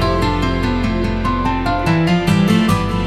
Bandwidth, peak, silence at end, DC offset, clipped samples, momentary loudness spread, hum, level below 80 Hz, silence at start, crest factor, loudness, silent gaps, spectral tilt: 14.5 kHz; -2 dBFS; 0 s; under 0.1%; under 0.1%; 5 LU; none; -26 dBFS; 0 s; 14 dB; -16 LUFS; none; -6.5 dB/octave